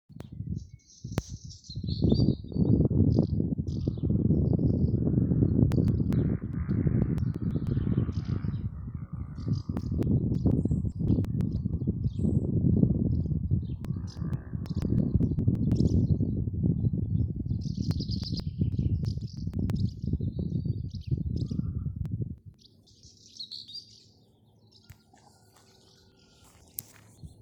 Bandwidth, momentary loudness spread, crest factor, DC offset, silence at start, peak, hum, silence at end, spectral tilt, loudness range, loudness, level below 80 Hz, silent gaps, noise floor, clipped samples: 19.5 kHz; 13 LU; 22 dB; under 0.1%; 0.1 s; -6 dBFS; none; 0.15 s; -8.5 dB/octave; 14 LU; -29 LUFS; -40 dBFS; none; -61 dBFS; under 0.1%